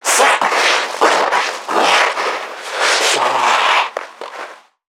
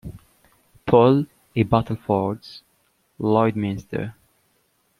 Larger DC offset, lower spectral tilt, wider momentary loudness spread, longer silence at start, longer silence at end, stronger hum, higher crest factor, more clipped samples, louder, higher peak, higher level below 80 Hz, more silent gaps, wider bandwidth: neither; second, 0.5 dB/octave vs -9 dB/octave; about the same, 17 LU vs 18 LU; about the same, 0.05 s vs 0.05 s; second, 0.4 s vs 0.9 s; neither; second, 16 dB vs 22 dB; neither; first, -14 LUFS vs -21 LUFS; about the same, 0 dBFS vs -2 dBFS; second, -80 dBFS vs -52 dBFS; neither; first, 20 kHz vs 14 kHz